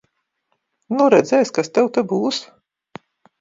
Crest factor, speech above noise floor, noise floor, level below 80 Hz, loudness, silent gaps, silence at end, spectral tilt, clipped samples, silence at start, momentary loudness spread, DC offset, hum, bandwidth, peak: 20 dB; 55 dB; -72 dBFS; -68 dBFS; -18 LUFS; none; 0.95 s; -5 dB/octave; under 0.1%; 0.9 s; 10 LU; under 0.1%; none; 7.8 kHz; 0 dBFS